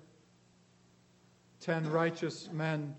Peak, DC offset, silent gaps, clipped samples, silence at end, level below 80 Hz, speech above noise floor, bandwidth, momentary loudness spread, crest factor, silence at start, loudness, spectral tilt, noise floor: -18 dBFS; under 0.1%; none; under 0.1%; 0 s; -82 dBFS; 32 dB; 8.4 kHz; 7 LU; 20 dB; 1.6 s; -35 LUFS; -6.5 dB/octave; -65 dBFS